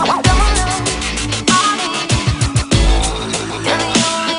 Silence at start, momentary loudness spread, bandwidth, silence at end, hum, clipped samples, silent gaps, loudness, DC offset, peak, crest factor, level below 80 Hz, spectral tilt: 0 s; 5 LU; 11 kHz; 0 s; none; under 0.1%; none; -15 LUFS; under 0.1%; 0 dBFS; 14 dB; -20 dBFS; -3.5 dB/octave